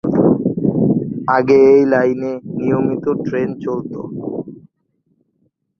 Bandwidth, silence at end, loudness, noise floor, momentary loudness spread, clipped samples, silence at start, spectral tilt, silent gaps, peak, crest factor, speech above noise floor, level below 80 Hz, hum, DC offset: 6.4 kHz; 1.25 s; -16 LUFS; -65 dBFS; 16 LU; under 0.1%; 0.05 s; -9.5 dB/octave; none; -2 dBFS; 14 dB; 50 dB; -52 dBFS; none; under 0.1%